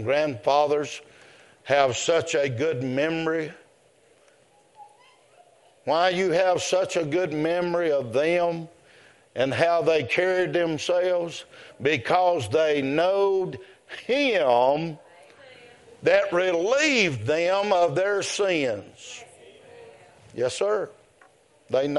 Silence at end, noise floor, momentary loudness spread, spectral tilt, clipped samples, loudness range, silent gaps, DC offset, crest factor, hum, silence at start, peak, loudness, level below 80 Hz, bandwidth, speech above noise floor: 0 s; -59 dBFS; 15 LU; -4.5 dB/octave; under 0.1%; 6 LU; none; under 0.1%; 20 dB; none; 0 s; -4 dBFS; -23 LUFS; -68 dBFS; 11.5 kHz; 36 dB